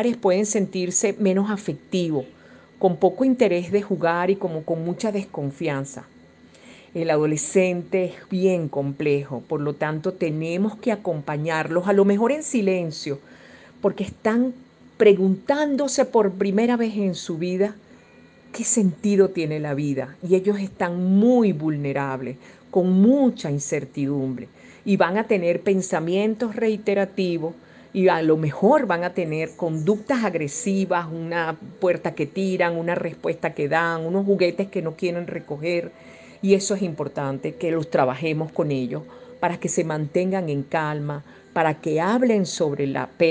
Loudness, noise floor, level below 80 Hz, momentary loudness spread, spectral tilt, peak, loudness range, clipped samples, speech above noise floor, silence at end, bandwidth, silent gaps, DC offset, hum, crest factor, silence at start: -23 LUFS; -50 dBFS; -64 dBFS; 9 LU; -5.5 dB/octave; -4 dBFS; 4 LU; under 0.1%; 28 dB; 0 s; 9.8 kHz; none; under 0.1%; none; 18 dB; 0 s